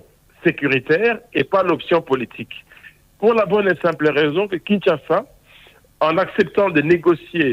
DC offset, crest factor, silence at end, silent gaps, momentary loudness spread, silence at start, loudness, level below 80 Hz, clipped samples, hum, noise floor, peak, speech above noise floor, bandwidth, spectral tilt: under 0.1%; 16 dB; 0 s; none; 6 LU; 0.45 s; -18 LUFS; -56 dBFS; under 0.1%; none; -49 dBFS; -4 dBFS; 31 dB; 15 kHz; -7.5 dB/octave